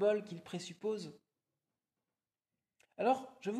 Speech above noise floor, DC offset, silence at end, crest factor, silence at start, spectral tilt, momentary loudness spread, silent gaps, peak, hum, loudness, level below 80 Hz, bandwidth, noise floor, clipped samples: over 53 dB; under 0.1%; 0 s; 18 dB; 0 s; -5.5 dB/octave; 11 LU; none; -20 dBFS; none; -38 LUFS; -88 dBFS; 13 kHz; under -90 dBFS; under 0.1%